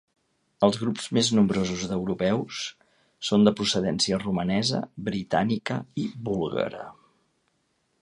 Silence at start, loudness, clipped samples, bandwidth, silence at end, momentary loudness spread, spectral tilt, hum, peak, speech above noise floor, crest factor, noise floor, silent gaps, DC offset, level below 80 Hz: 0.6 s; -26 LUFS; under 0.1%; 11 kHz; 1.1 s; 11 LU; -5 dB/octave; none; -6 dBFS; 47 dB; 22 dB; -72 dBFS; none; under 0.1%; -56 dBFS